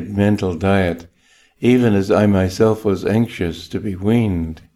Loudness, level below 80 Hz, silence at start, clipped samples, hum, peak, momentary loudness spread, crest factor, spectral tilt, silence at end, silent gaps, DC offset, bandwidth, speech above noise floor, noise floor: -17 LUFS; -42 dBFS; 0 s; under 0.1%; none; -2 dBFS; 10 LU; 14 dB; -7.5 dB/octave; 0.15 s; none; under 0.1%; 13.5 kHz; 38 dB; -55 dBFS